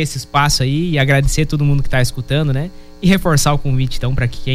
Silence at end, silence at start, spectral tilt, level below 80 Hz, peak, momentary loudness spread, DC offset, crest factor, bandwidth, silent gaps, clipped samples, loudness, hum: 0 s; 0 s; -5 dB/octave; -24 dBFS; -2 dBFS; 6 LU; under 0.1%; 12 dB; 15.5 kHz; none; under 0.1%; -16 LUFS; none